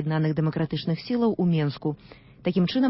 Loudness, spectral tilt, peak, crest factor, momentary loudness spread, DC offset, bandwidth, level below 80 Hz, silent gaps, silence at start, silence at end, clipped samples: -26 LUFS; -11.5 dB/octave; -12 dBFS; 12 dB; 8 LU; under 0.1%; 5.8 kHz; -58 dBFS; none; 0 s; 0 s; under 0.1%